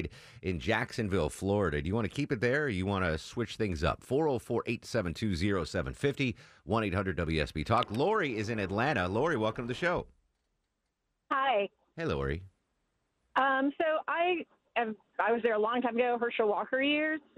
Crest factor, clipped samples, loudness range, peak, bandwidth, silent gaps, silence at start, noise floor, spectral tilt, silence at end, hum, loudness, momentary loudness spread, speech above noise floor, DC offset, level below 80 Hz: 18 dB; under 0.1%; 3 LU; -14 dBFS; 15 kHz; none; 0 s; -82 dBFS; -6 dB/octave; 0.2 s; none; -31 LUFS; 7 LU; 51 dB; under 0.1%; -50 dBFS